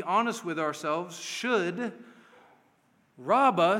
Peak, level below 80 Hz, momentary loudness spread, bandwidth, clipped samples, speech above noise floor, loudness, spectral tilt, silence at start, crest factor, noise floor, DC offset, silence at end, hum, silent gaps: -12 dBFS; -86 dBFS; 12 LU; 16.5 kHz; under 0.1%; 39 dB; -28 LUFS; -4.5 dB/octave; 0 s; 18 dB; -67 dBFS; under 0.1%; 0 s; none; none